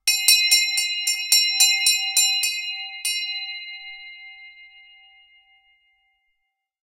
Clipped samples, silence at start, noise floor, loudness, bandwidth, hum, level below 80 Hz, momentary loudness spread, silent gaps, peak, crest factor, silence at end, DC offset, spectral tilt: under 0.1%; 0.05 s; -77 dBFS; -18 LUFS; 16 kHz; none; -74 dBFS; 21 LU; none; 0 dBFS; 24 dB; 2.2 s; under 0.1%; 8.5 dB/octave